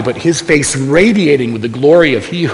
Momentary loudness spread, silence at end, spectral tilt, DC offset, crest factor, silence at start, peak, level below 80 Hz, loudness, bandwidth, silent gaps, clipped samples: 6 LU; 0 s; -5 dB/octave; under 0.1%; 10 dB; 0 s; 0 dBFS; -40 dBFS; -11 LUFS; 11 kHz; none; 0.1%